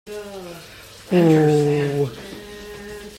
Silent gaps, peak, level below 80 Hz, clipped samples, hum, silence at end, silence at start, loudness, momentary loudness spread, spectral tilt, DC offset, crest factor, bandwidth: none; -4 dBFS; -52 dBFS; under 0.1%; none; 0 s; 0.05 s; -18 LUFS; 22 LU; -7 dB/octave; under 0.1%; 16 dB; 16 kHz